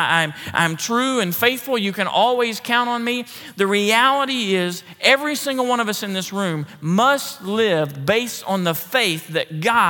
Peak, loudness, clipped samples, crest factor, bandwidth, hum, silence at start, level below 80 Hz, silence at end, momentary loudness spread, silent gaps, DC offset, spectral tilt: 0 dBFS; -19 LUFS; under 0.1%; 18 dB; 19 kHz; none; 0 s; -70 dBFS; 0 s; 8 LU; none; under 0.1%; -3.5 dB/octave